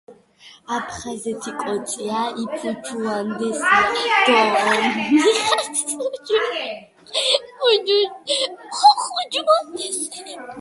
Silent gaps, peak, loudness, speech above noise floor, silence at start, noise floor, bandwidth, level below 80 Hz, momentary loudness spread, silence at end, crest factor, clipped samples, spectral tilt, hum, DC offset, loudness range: none; -2 dBFS; -20 LUFS; 28 dB; 0.1 s; -48 dBFS; 12 kHz; -60 dBFS; 13 LU; 0 s; 20 dB; under 0.1%; -2 dB/octave; none; under 0.1%; 6 LU